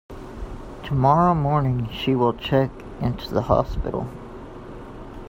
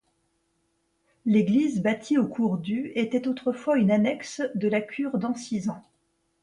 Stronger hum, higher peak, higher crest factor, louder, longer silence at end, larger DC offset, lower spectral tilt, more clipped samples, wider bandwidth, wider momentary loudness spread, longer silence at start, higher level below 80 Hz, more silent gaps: neither; first, -2 dBFS vs -12 dBFS; about the same, 20 dB vs 16 dB; first, -22 LUFS vs -26 LUFS; second, 0 s vs 0.65 s; neither; first, -8.5 dB/octave vs -6.5 dB/octave; neither; first, 16 kHz vs 11 kHz; first, 20 LU vs 9 LU; second, 0.1 s vs 1.25 s; first, -38 dBFS vs -68 dBFS; neither